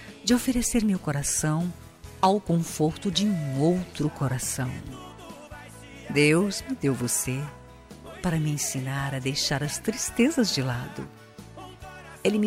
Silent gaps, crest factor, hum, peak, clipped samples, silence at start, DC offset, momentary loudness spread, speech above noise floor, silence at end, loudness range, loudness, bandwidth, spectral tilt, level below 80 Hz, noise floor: none; 18 dB; none; -8 dBFS; under 0.1%; 0 s; under 0.1%; 21 LU; 20 dB; 0 s; 2 LU; -26 LUFS; 16 kHz; -4.5 dB/octave; -50 dBFS; -45 dBFS